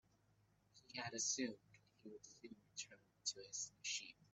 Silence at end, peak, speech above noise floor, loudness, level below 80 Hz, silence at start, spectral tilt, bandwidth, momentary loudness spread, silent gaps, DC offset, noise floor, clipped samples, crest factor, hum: 0.1 s; -30 dBFS; 28 dB; -46 LUFS; -88 dBFS; 0.75 s; -1 dB/octave; 8.8 kHz; 19 LU; none; under 0.1%; -78 dBFS; under 0.1%; 22 dB; none